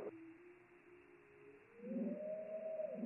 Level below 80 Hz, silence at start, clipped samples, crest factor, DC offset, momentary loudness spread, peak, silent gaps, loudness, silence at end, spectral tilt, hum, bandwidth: under -90 dBFS; 0 s; under 0.1%; 16 dB; under 0.1%; 20 LU; -32 dBFS; none; -47 LUFS; 0 s; -6 dB/octave; none; 2.9 kHz